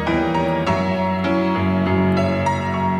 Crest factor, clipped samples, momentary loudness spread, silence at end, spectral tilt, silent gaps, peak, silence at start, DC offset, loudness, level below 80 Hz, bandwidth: 12 dB; under 0.1%; 2 LU; 0 s; -7.5 dB/octave; none; -6 dBFS; 0 s; under 0.1%; -19 LUFS; -46 dBFS; 9.6 kHz